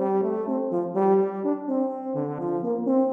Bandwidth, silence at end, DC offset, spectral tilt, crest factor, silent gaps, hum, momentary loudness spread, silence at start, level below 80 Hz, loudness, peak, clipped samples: 3.1 kHz; 0 s; under 0.1%; -11.5 dB/octave; 14 dB; none; none; 6 LU; 0 s; -76 dBFS; -25 LUFS; -10 dBFS; under 0.1%